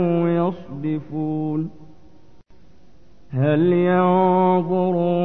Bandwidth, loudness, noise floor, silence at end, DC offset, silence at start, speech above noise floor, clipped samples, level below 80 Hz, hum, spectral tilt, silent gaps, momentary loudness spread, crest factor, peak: 4.1 kHz; -20 LUFS; -53 dBFS; 0 s; 0.8%; 0 s; 34 dB; under 0.1%; -56 dBFS; none; -11 dB/octave; none; 10 LU; 14 dB; -6 dBFS